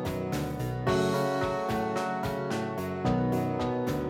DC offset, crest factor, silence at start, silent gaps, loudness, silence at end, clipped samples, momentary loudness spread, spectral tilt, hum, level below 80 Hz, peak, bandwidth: under 0.1%; 14 dB; 0 s; none; -30 LUFS; 0 s; under 0.1%; 5 LU; -6.5 dB/octave; none; -48 dBFS; -14 dBFS; 17.5 kHz